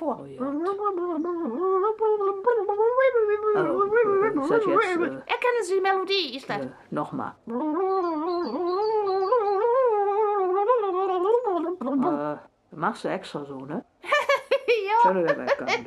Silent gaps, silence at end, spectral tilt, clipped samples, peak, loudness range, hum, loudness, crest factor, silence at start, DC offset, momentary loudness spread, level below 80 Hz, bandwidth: none; 0 s; -5 dB/octave; under 0.1%; -8 dBFS; 4 LU; none; -24 LUFS; 16 dB; 0 s; under 0.1%; 11 LU; -68 dBFS; 12 kHz